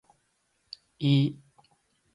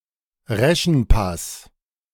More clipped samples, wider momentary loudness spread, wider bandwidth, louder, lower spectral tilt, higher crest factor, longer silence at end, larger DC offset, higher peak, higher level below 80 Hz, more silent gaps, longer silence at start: neither; first, 23 LU vs 14 LU; second, 10.5 kHz vs 17.5 kHz; second, -26 LUFS vs -20 LUFS; first, -8 dB/octave vs -5 dB/octave; about the same, 18 dB vs 18 dB; first, 0.8 s vs 0.55 s; neither; second, -12 dBFS vs -2 dBFS; second, -72 dBFS vs -26 dBFS; neither; first, 1 s vs 0.5 s